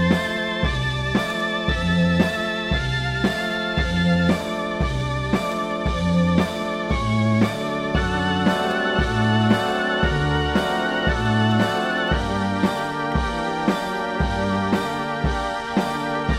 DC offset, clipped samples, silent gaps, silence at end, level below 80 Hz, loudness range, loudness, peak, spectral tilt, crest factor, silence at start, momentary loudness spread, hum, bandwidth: under 0.1%; under 0.1%; none; 0 s; -32 dBFS; 2 LU; -22 LUFS; -4 dBFS; -6 dB/octave; 16 dB; 0 s; 5 LU; none; 14.5 kHz